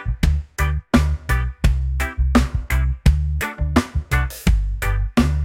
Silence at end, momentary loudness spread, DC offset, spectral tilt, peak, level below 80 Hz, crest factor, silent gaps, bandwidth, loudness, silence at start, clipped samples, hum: 0 s; 5 LU; under 0.1%; -6 dB/octave; -2 dBFS; -20 dBFS; 16 dB; none; 16.5 kHz; -21 LUFS; 0 s; under 0.1%; none